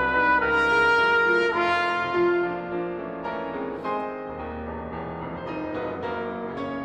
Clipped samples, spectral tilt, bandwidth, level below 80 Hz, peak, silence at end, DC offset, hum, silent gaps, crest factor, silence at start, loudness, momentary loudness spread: under 0.1%; -5.5 dB/octave; 9.4 kHz; -50 dBFS; -10 dBFS; 0 s; under 0.1%; none; none; 16 dB; 0 s; -25 LUFS; 14 LU